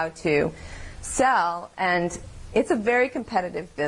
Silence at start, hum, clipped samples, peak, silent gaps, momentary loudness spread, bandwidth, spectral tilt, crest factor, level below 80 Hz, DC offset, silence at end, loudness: 0 s; none; under 0.1%; -10 dBFS; none; 14 LU; 11.5 kHz; -4.5 dB/octave; 16 dB; -46 dBFS; under 0.1%; 0 s; -24 LUFS